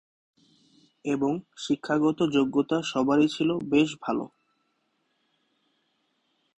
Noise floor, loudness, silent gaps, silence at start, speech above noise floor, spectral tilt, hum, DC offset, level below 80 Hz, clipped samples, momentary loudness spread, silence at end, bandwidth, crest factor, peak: -74 dBFS; -26 LUFS; none; 1.05 s; 49 dB; -5.5 dB/octave; none; under 0.1%; -66 dBFS; under 0.1%; 9 LU; 2.3 s; 8.4 kHz; 18 dB; -10 dBFS